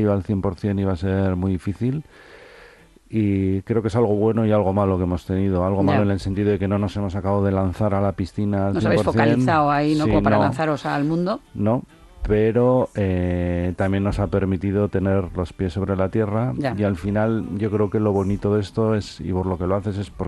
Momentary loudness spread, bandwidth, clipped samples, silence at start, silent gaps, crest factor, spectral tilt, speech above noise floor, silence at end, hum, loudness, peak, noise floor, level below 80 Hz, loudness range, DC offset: 6 LU; 11.5 kHz; under 0.1%; 0 s; none; 18 dB; -8.5 dB/octave; 28 dB; 0 s; none; -21 LUFS; -4 dBFS; -48 dBFS; -40 dBFS; 3 LU; under 0.1%